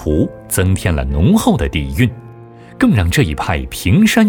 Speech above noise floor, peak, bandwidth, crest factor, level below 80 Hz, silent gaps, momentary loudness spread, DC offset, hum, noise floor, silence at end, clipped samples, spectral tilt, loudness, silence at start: 23 dB; -2 dBFS; 19 kHz; 14 dB; -26 dBFS; none; 7 LU; under 0.1%; none; -36 dBFS; 0 s; under 0.1%; -6 dB/octave; -15 LUFS; 0 s